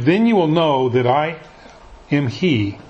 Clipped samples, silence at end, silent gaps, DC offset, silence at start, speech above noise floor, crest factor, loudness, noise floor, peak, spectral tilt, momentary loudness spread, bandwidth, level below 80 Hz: under 0.1%; 0.1 s; none; under 0.1%; 0 s; 25 dB; 16 dB; -17 LUFS; -41 dBFS; -2 dBFS; -7.5 dB/octave; 7 LU; 8.2 kHz; -50 dBFS